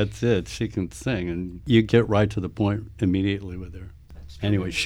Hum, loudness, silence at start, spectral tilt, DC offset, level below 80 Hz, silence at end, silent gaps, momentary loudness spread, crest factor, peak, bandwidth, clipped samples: none; -24 LUFS; 0 s; -6.5 dB/octave; under 0.1%; -42 dBFS; 0 s; none; 16 LU; 20 dB; -4 dBFS; 12.5 kHz; under 0.1%